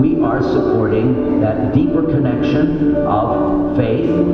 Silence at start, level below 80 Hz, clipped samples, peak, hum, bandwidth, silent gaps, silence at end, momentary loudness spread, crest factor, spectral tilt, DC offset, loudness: 0 s; -34 dBFS; under 0.1%; -2 dBFS; none; 6.2 kHz; none; 0 s; 1 LU; 12 dB; -10 dB/octave; under 0.1%; -15 LUFS